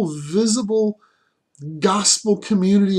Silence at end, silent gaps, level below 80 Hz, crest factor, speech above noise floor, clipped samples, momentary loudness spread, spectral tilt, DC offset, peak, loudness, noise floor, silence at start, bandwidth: 0 s; none; -64 dBFS; 18 dB; 44 dB; under 0.1%; 17 LU; -4.5 dB/octave; under 0.1%; -2 dBFS; -18 LUFS; -62 dBFS; 0 s; 12 kHz